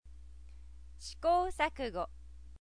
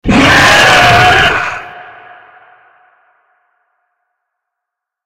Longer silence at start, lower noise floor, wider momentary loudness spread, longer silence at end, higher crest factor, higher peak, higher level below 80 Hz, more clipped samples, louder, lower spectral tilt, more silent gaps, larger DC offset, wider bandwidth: about the same, 0 s vs 0.05 s; second, -53 dBFS vs -79 dBFS; first, 25 LU vs 17 LU; second, 0 s vs 3.25 s; first, 20 dB vs 12 dB; second, -16 dBFS vs 0 dBFS; second, -52 dBFS vs -32 dBFS; second, under 0.1% vs 0.2%; second, -34 LUFS vs -6 LUFS; about the same, -4.5 dB/octave vs -3.5 dB/octave; neither; first, 0.2% vs under 0.1%; second, 11 kHz vs 17 kHz